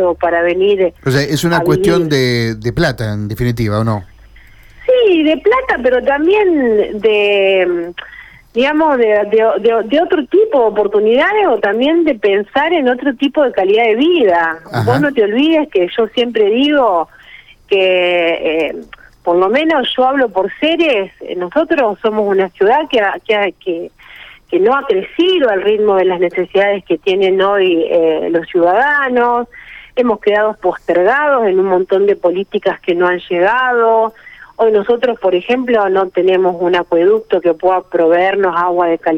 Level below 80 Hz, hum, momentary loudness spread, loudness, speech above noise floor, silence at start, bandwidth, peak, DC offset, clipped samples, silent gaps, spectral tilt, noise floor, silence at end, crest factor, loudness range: -44 dBFS; none; 6 LU; -13 LUFS; 28 dB; 0 s; 15.5 kHz; -2 dBFS; under 0.1%; under 0.1%; none; -6 dB/octave; -40 dBFS; 0 s; 10 dB; 2 LU